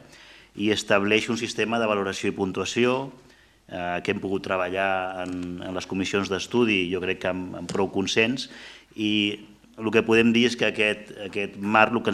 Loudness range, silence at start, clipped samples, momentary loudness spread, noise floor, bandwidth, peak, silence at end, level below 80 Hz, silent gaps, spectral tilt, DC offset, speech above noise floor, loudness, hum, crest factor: 4 LU; 0.15 s; under 0.1%; 12 LU; -50 dBFS; 13 kHz; -2 dBFS; 0 s; -62 dBFS; none; -4.5 dB/octave; under 0.1%; 25 dB; -24 LUFS; none; 24 dB